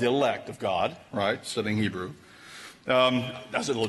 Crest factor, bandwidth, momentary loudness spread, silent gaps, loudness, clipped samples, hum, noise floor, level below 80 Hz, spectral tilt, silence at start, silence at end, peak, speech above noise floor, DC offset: 18 dB; 12 kHz; 19 LU; none; -27 LUFS; under 0.1%; none; -47 dBFS; -64 dBFS; -4.5 dB/octave; 0 s; 0 s; -10 dBFS; 20 dB; under 0.1%